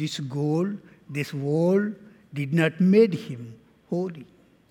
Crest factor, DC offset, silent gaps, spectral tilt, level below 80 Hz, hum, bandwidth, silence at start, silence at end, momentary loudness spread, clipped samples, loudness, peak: 18 dB; under 0.1%; none; -7.5 dB/octave; -72 dBFS; none; 13.5 kHz; 0 s; 0.5 s; 20 LU; under 0.1%; -25 LUFS; -6 dBFS